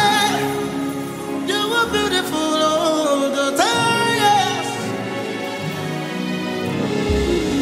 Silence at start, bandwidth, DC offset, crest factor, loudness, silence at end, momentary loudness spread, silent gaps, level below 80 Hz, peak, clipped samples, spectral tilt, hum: 0 s; 16 kHz; under 0.1%; 16 dB; -19 LUFS; 0 s; 9 LU; none; -38 dBFS; -4 dBFS; under 0.1%; -4 dB/octave; none